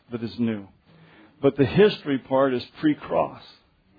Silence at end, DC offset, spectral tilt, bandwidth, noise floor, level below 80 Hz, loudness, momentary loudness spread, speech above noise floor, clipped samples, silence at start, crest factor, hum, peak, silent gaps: 0.6 s; under 0.1%; -9 dB/octave; 5 kHz; -53 dBFS; -56 dBFS; -23 LUFS; 10 LU; 30 dB; under 0.1%; 0.1 s; 20 dB; none; -6 dBFS; none